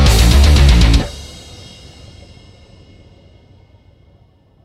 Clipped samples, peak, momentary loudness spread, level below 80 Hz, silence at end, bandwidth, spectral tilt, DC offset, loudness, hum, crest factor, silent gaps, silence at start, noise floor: under 0.1%; 0 dBFS; 26 LU; -16 dBFS; 3.4 s; 15 kHz; -5 dB/octave; under 0.1%; -11 LUFS; none; 14 dB; none; 0 s; -50 dBFS